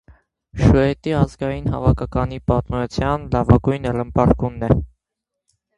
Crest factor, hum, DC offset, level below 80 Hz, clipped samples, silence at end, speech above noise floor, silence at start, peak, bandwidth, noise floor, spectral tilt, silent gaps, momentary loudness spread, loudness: 18 dB; none; under 0.1%; -30 dBFS; under 0.1%; 0.9 s; 64 dB; 0.55 s; 0 dBFS; 10.5 kHz; -82 dBFS; -8.5 dB/octave; none; 7 LU; -19 LUFS